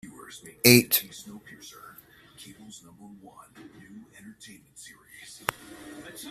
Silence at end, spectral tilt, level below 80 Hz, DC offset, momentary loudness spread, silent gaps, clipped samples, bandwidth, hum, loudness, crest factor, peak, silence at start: 0 s; -3.5 dB/octave; -64 dBFS; under 0.1%; 30 LU; none; under 0.1%; 15 kHz; none; -22 LUFS; 28 dB; -2 dBFS; 0.65 s